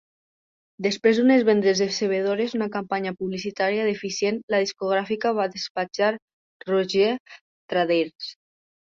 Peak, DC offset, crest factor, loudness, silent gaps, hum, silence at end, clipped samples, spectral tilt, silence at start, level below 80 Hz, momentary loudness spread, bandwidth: -6 dBFS; under 0.1%; 18 dB; -23 LUFS; 4.43-4.48 s, 5.70-5.75 s, 6.22-6.60 s, 7.20-7.25 s, 7.41-7.69 s, 8.15-8.19 s; none; 0.6 s; under 0.1%; -4.5 dB/octave; 0.8 s; -68 dBFS; 10 LU; 7.6 kHz